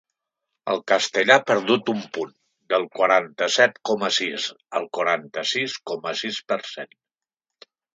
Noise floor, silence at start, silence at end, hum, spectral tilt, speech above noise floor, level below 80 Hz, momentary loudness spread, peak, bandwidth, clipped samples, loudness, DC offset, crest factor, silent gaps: -88 dBFS; 0.65 s; 1.1 s; none; -2.5 dB/octave; 66 dB; -76 dBFS; 13 LU; 0 dBFS; 9.4 kHz; under 0.1%; -22 LUFS; under 0.1%; 22 dB; none